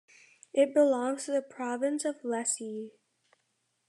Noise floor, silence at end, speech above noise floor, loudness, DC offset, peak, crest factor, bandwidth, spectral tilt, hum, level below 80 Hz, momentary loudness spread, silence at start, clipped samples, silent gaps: -77 dBFS; 1 s; 48 dB; -30 LUFS; under 0.1%; -14 dBFS; 18 dB; 12.5 kHz; -3 dB/octave; none; under -90 dBFS; 13 LU; 0.55 s; under 0.1%; none